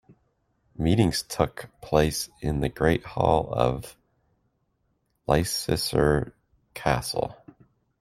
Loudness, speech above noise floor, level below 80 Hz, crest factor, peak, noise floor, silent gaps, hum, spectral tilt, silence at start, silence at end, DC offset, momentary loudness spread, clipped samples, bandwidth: -25 LUFS; 48 dB; -42 dBFS; 22 dB; -4 dBFS; -73 dBFS; none; none; -5.5 dB/octave; 0.8 s; 0.65 s; under 0.1%; 13 LU; under 0.1%; 16 kHz